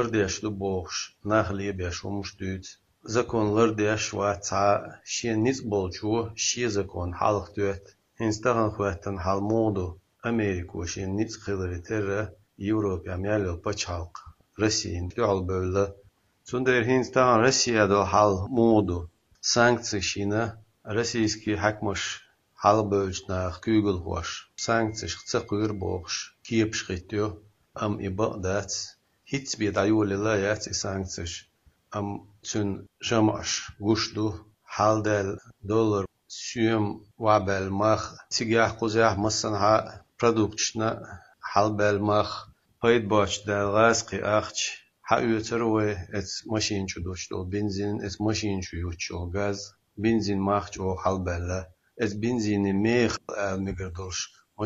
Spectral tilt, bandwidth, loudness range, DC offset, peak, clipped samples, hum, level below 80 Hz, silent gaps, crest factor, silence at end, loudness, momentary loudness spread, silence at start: -4.5 dB/octave; 8 kHz; 6 LU; under 0.1%; -4 dBFS; under 0.1%; none; -52 dBFS; none; 22 dB; 0 s; -27 LUFS; 11 LU; 0 s